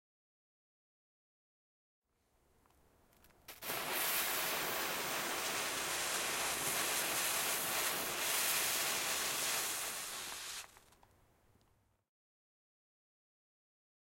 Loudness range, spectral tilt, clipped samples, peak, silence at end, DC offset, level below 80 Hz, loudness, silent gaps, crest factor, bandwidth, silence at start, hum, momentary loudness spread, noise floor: 13 LU; 0 dB/octave; under 0.1%; -22 dBFS; 3.35 s; under 0.1%; -72 dBFS; -35 LUFS; none; 18 dB; 16.5 kHz; 3.5 s; none; 9 LU; -76 dBFS